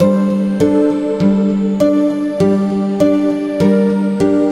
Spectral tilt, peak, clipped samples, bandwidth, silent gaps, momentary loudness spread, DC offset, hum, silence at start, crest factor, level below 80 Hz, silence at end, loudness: -8 dB/octave; 0 dBFS; under 0.1%; 11.5 kHz; none; 3 LU; under 0.1%; none; 0 s; 12 dB; -48 dBFS; 0 s; -14 LUFS